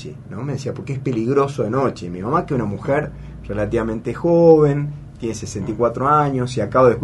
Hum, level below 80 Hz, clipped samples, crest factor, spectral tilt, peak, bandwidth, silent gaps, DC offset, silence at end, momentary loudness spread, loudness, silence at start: none; -42 dBFS; under 0.1%; 18 dB; -7.5 dB/octave; -2 dBFS; 11.5 kHz; none; under 0.1%; 0 s; 14 LU; -19 LUFS; 0 s